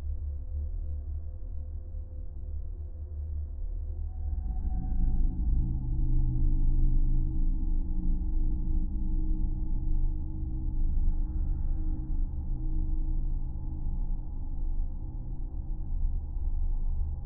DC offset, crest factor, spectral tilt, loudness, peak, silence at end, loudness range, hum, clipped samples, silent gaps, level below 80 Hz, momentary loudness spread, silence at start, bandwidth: under 0.1%; 14 dB; -14 dB/octave; -35 LUFS; -14 dBFS; 0 s; 7 LU; none; under 0.1%; none; -28 dBFS; 9 LU; 0 s; 1 kHz